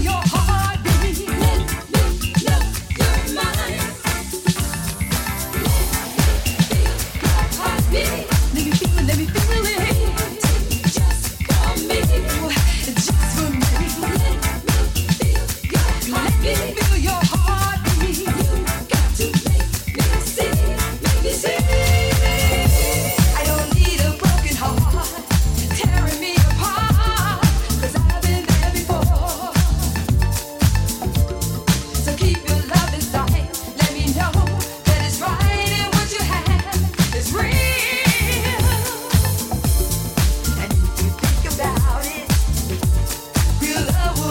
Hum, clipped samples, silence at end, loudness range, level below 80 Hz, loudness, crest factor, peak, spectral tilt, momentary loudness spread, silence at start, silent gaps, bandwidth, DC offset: none; under 0.1%; 0 s; 2 LU; -22 dBFS; -19 LUFS; 16 dB; -2 dBFS; -4.5 dB/octave; 4 LU; 0 s; none; 17.5 kHz; under 0.1%